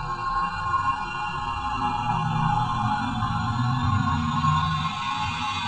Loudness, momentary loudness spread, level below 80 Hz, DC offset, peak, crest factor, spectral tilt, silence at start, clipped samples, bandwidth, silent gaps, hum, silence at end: -25 LUFS; 5 LU; -42 dBFS; under 0.1%; -10 dBFS; 16 dB; -5.5 dB/octave; 0 s; under 0.1%; 9 kHz; none; none; 0 s